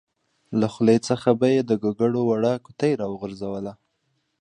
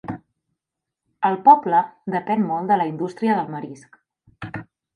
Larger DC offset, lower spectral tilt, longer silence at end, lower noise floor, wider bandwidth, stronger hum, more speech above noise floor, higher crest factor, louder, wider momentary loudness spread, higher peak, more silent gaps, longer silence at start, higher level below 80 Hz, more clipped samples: neither; about the same, -7 dB/octave vs -8 dB/octave; first, 0.65 s vs 0.3 s; second, -72 dBFS vs -84 dBFS; about the same, 10 kHz vs 9.8 kHz; neither; second, 50 dB vs 65 dB; about the same, 18 dB vs 20 dB; second, -23 LUFS vs -20 LUFS; second, 11 LU vs 22 LU; about the same, -4 dBFS vs -2 dBFS; neither; first, 0.5 s vs 0.05 s; about the same, -62 dBFS vs -62 dBFS; neither